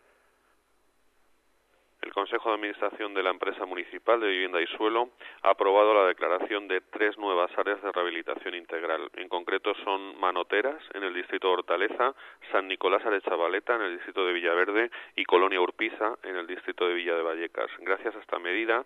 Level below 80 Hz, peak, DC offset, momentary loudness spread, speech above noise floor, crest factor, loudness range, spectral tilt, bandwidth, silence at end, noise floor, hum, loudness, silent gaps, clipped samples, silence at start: -80 dBFS; -8 dBFS; under 0.1%; 9 LU; 40 dB; 20 dB; 5 LU; -4 dB/octave; 5 kHz; 0 s; -68 dBFS; none; -28 LUFS; none; under 0.1%; 2 s